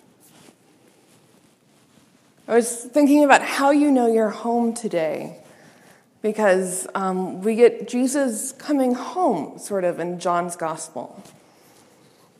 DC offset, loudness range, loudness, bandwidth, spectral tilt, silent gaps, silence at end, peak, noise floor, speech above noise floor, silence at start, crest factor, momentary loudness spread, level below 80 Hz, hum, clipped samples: under 0.1%; 6 LU; -21 LUFS; 14.5 kHz; -4.5 dB/octave; none; 1.15 s; 0 dBFS; -57 dBFS; 37 dB; 2.5 s; 22 dB; 12 LU; -80 dBFS; none; under 0.1%